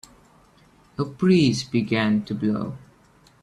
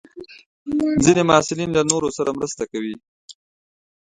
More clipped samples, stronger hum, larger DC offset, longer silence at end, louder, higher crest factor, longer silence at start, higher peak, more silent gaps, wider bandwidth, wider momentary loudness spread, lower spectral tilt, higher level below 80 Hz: neither; neither; neither; about the same, 0.65 s vs 0.75 s; second, -22 LUFS vs -19 LUFS; about the same, 16 dB vs 20 dB; first, 1 s vs 0.15 s; second, -8 dBFS vs 0 dBFS; second, none vs 0.46-0.66 s, 3.08-3.28 s; first, 11 kHz vs 9.8 kHz; second, 16 LU vs 22 LU; first, -6.5 dB/octave vs -4.5 dB/octave; second, -58 dBFS vs -50 dBFS